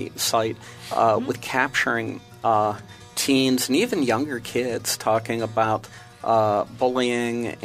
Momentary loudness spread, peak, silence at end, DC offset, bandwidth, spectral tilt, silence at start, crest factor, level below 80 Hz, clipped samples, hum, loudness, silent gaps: 9 LU; -4 dBFS; 0 s; under 0.1%; 15.5 kHz; -4 dB/octave; 0 s; 18 dB; -60 dBFS; under 0.1%; none; -23 LUFS; none